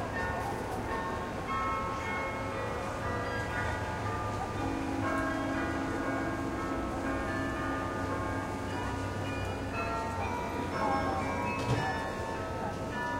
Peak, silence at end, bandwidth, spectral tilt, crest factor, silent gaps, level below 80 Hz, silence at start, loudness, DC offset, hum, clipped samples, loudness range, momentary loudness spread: -18 dBFS; 0 s; 16 kHz; -6 dB/octave; 16 dB; none; -46 dBFS; 0 s; -34 LUFS; under 0.1%; none; under 0.1%; 1 LU; 4 LU